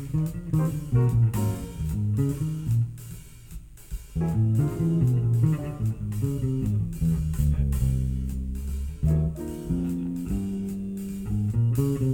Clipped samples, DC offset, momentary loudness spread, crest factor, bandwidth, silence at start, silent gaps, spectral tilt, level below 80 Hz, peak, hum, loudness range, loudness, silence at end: under 0.1%; under 0.1%; 10 LU; 14 dB; 17.5 kHz; 0 s; none; -8.5 dB/octave; -34 dBFS; -12 dBFS; none; 3 LU; -27 LUFS; 0 s